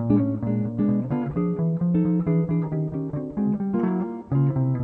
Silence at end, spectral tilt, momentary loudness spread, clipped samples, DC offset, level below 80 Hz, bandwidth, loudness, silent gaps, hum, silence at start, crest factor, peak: 0 s; -12.5 dB/octave; 5 LU; under 0.1%; under 0.1%; -50 dBFS; 3 kHz; -24 LUFS; none; none; 0 s; 14 dB; -8 dBFS